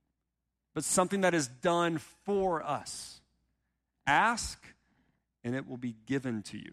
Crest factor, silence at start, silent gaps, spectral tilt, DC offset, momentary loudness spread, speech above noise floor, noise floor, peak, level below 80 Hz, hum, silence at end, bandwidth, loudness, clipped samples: 20 dB; 0.75 s; none; -4 dB/octave; under 0.1%; 15 LU; 54 dB; -85 dBFS; -12 dBFS; -60 dBFS; none; 0 s; 15.5 kHz; -32 LUFS; under 0.1%